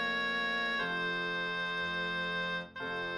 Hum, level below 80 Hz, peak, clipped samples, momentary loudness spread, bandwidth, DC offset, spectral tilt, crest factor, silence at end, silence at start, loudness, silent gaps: none; -72 dBFS; -24 dBFS; under 0.1%; 5 LU; 11.5 kHz; under 0.1%; -4.5 dB/octave; 12 dB; 0 s; 0 s; -33 LUFS; none